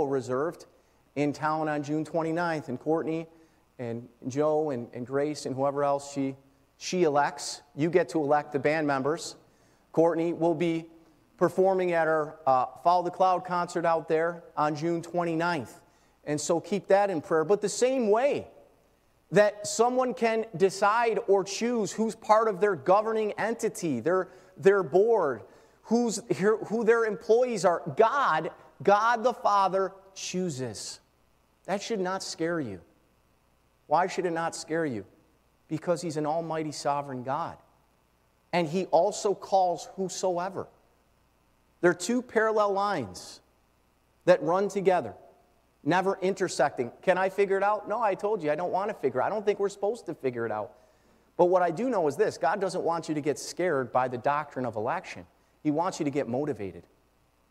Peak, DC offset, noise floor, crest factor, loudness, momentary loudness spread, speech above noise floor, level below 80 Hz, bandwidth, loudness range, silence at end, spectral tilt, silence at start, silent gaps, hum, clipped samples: -8 dBFS; under 0.1%; -67 dBFS; 20 dB; -28 LUFS; 11 LU; 40 dB; -70 dBFS; 14.5 kHz; 6 LU; 0.7 s; -5 dB/octave; 0 s; none; none; under 0.1%